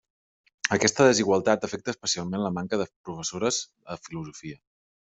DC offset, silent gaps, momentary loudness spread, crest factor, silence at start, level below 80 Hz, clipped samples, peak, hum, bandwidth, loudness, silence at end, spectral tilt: under 0.1%; 2.96-3.04 s; 19 LU; 24 dB; 0.65 s; -64 dBFS; under 0.1%; -2 dBFS; none; 8.2 kHz; -25 LUFS; 0.55 s; -3.5 dB/octave